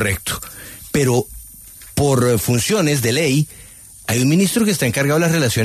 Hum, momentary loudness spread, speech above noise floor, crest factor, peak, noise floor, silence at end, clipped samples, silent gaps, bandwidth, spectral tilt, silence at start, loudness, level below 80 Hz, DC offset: none; 17 LU; 23 dB; 14 dB; -4 dBFS; -39 dBFS; 0 s; under 0.1%; none; 14 kHz; -4.5 dB/octave; 0 s; -17 LUFS; -42 dBFS; under 0.1%